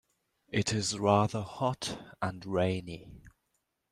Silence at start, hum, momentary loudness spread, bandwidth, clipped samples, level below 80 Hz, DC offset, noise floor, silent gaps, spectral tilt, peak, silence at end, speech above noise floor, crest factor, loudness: 0.5 s; none; 11 LU; 13.5 kHz; under 0.1%; -62 dBFS; under 0.1%; -80 dBFS; none; -5 dB/octave; -10 dBFS; 0.6 s; 49 dB; 22 dB; -31 LUFS